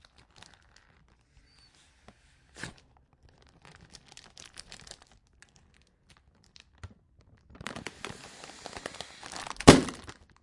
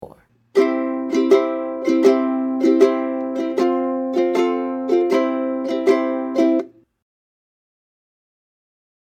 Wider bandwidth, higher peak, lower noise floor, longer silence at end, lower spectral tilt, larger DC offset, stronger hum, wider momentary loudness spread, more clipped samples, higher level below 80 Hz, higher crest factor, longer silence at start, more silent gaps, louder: first, 12 kHz vs 9.2 kHz; about the same, 0 dBFS vs -2 dBFS; first, -64 dBFS vs -48 dBFS; second, 0.5 s vs 2.35 s; about the same, -4.5 dB/octave vs -5 dB/octave; neither; neither; first, 31 LU vs 7 LU; neither; first, -48 dBFS vs -72 dBFS; first, 32 dB vs 18 dB; first, 2.65 s vs 0 s; neither; second, -26 LUFS vs -19 LUFS